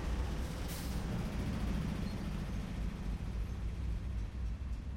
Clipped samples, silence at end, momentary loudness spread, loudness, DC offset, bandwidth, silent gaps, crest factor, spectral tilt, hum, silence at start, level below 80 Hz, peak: under 0.1%; 0 s; 4 LU; -40 LUFS; under 0.1%; 16.5 kHz; none; 12 dB; -6.5 dB/octave; none; 0 s; -40 dBFS; -26 dBFS